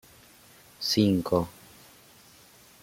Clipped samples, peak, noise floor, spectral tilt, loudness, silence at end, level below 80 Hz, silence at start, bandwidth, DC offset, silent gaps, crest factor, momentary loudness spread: under 0.1%; -10 dBFS; -55 dBFS; -5.5 dB/octave; -26 LUFS; 1.35 s; -60 dBFS; 0.8 s; 16.5 kHz; under 0.1%; none; 22 dB; 10 LU